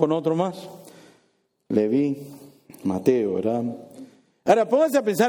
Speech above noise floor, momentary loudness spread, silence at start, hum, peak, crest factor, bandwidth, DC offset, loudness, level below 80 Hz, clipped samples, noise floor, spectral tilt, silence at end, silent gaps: 46 dB; 20 LU; 0 s; none; -4 dBFS; 20 dB; over 20 kHz; under 0.1%; -23 LUFS; -70 dBFS; under 0.1%; -67 dBFS; -6.5 dB/octave; 0 s; none